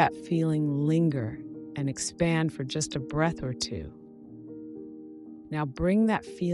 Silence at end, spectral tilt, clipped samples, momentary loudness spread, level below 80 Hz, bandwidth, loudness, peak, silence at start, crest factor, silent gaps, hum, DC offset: 0 s; -5.5 dB/octave; under 0.1%; 19 LU; -52 dBFS; 12 kHz; -28 LUFS; -10 dBFS; 0 s; 20 dB; none; none; under 0.1%